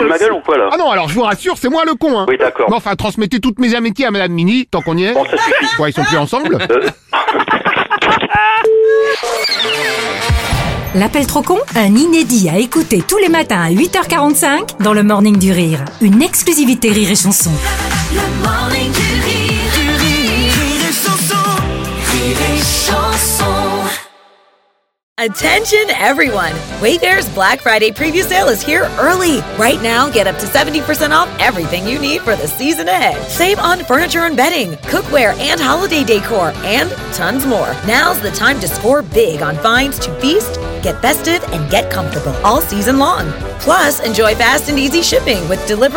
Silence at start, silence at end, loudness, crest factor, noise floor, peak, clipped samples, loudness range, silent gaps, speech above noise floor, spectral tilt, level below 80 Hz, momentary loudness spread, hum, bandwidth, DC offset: 0 s; 0 s; -12 LUFS; 12 dB; -58 dBFS; 0 dBFS; under 0.1%; 3 LU; 25.03-25.16 s; 45 dB; -3.5 dB/octave; -30 dBFS; 6 LU; none; 17 kHz; under 0.1%